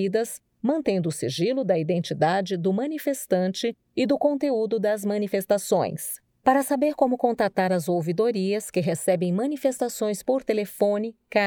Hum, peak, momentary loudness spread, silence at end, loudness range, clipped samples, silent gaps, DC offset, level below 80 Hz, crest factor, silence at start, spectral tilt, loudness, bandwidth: none; -6 dBFS; 5 LU; 0 s; 1 LU; under 0.1%; none; under 0.1%; -68 dBFS; 18 dB; 0 s; -5.5 dB/octave; -25 LUFS; over 20 kHz